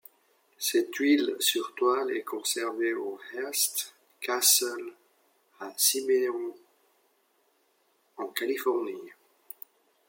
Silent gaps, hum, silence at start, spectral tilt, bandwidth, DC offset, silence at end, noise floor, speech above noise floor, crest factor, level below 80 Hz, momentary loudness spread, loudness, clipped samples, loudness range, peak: none; none; 0.6 s; 0 dB/octave; 17 kHz; under 0.1%; 0.95 s; -70 dBFS; 42 dB; 22 dB; -90 dBFS; 19 LU; -27 LUFS; under 0.1%; 9 LU; -8 dBFS